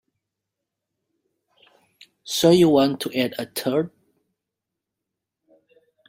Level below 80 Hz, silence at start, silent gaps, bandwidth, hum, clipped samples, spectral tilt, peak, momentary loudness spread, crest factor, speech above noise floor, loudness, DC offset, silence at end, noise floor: -64 dBFS; 2.25 s; none; 16 kHz; none; under 0.1%; -5 dB/octave; -4 dBFS; 12 LU; 20 dB; 65 dB; -20 LUFS; under 0.1%; 2.2 s; -84 dBFS